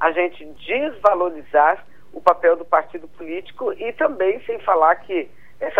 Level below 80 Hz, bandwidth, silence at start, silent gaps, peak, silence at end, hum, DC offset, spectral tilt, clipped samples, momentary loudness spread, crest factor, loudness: -58 dBFS; 7.6 kHz; 0 s; none; -2 dBFS; 0 s; none; 1%; -5.5 dB/octave; under 0.1%; 15 LU; 18 dB; -20 LUFS